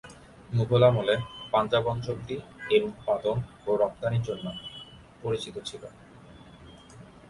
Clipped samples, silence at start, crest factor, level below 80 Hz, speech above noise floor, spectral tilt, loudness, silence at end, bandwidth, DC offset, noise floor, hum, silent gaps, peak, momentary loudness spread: under 0.1%; 0.05 s; 20 dB; -54 dBFS; 23 dB; -6.5 dB/octave; -28 LUFS; 0.2 s; 11.5 kHz; under 0.1%; -50 dBFS; none; none; -8 dBFS; 18 LU